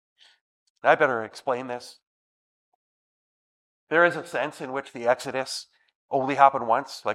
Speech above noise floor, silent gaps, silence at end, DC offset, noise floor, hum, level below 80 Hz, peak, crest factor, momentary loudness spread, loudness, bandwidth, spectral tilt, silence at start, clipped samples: over 66 dB; 2.07-3.87 s, 5.95-6.08 s; 0 s; under 0.1%; under -90 dBFS; none; -78 dBFS; -2 dBFS; 24 dB; 14 LU; -24 LUFS; 14.5 kHz; -4 dB/octave; 0.85 s; under 0.1%